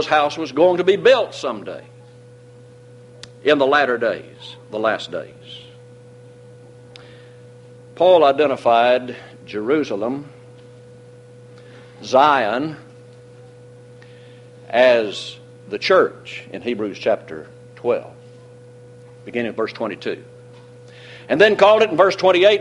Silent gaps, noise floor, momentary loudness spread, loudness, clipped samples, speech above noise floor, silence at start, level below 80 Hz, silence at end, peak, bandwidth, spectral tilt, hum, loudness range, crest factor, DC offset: none; -44 dBFS; 23 LU; -17 LUFS; under 0.1%; 26 dB; 0 s; -64 dBFS; 0 s; 0 dBFS; 11 kHz; -5 dB/octave; none; 9 LU; 20 dB; under 0.1%